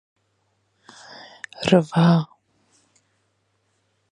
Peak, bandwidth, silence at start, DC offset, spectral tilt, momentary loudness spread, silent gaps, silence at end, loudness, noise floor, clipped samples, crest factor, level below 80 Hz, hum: -2 dBFS; 9.8 kHz; 1.6 s; under 0.1%; -7 dB/octave; 25 LU; none; 1.9 s; -19 LUFS; -69 dBFS; under 0.1%; 24 dB; -62 dBFS; none